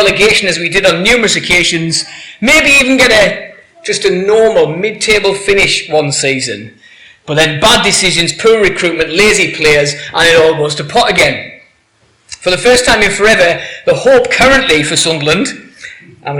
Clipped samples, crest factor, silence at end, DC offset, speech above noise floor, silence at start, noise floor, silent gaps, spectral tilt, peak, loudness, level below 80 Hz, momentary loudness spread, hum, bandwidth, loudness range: under 0.1%; 10 dB; 0 s; under 0.1%; 42 dB; 0 s; -52 dBFS; none; -2.5 dB/octave; 0 dBFS; -9 LUFS; -34 dBFS; 9 LU; none; 18.5 kHz; 3 LU